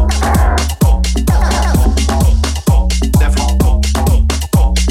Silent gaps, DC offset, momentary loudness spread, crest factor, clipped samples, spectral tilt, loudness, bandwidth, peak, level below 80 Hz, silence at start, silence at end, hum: none; under 0.1%; 1 LU; 10 dB; under 0.1%; -5.5 dB/octave; -13 LUFS; 15.5 kHz; 0 dBFS; -12 dBFS; 0 s; 0 s; none